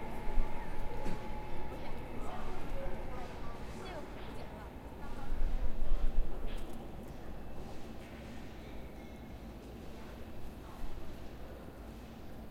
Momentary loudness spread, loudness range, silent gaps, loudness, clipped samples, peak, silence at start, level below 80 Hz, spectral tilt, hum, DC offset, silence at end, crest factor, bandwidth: 8 LU; 6 LU; none; -46 LUFS; under 0.1%; -16 dBFS; 0 s; -40 dBFS; -6.5 dB/octave; none; under 0.1%; 0 s; 18 dB; 5.8 kHz